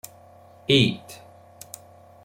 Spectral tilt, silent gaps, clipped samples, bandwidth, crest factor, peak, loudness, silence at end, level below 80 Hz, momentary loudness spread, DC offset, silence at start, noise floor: -5 dB/octave; none; under 0.1%; 16.5 kHz; 22 dB; -4 dBFS; -20 LUFS; 1.1 s; -60 dBFS; 25 LU; under 0.1%; 0.7 s; -50 dBFS